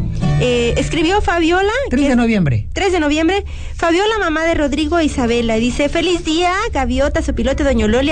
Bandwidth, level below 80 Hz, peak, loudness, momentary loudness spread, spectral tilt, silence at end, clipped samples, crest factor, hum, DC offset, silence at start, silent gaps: 9.4 kHz; -26 dBFS; -6 dBFS; -15 LUFS; 3 LU; -5.5 dB/octave; 0 s; under 0.1%; 10 dB; none; under 0.1%; 0 s; none